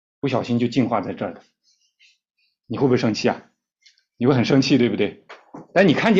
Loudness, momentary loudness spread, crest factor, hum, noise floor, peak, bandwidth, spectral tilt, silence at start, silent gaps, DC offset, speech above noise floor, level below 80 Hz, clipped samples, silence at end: -20 LUFS; 14 LU; 18 dB; none; -60 dBFS; -4 dBFS; 7.6 kHz; -6.5 dB/octave; 0.25 s; none; under 0.1%; 40 dB; -58 dBFS; under 0.1%; 0 s